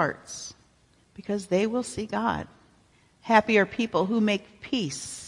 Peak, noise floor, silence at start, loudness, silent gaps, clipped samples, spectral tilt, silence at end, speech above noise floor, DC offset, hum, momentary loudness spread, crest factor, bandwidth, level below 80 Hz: -4 dBFS; -62 dBFS; 0 s; -26 LUFS; none; under 0.1%; -4.5 dB/octave; 0 s; 36 dB; under 0.1%; none; 16 LU; 24 dB; 11.5 kHz; -60 dBFS